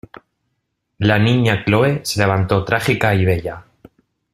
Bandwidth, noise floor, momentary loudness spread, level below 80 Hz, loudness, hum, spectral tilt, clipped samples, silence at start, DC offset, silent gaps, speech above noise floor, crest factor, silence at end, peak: 15 kHz; -72 dBFS; 6 LU; -46 dBFS; -16 LUFS; none; -6 dB/octave; under 0.1%; 1 s; under 0.1%; none; 57 dB; 18 dB; 0.7 s; 0 dBFS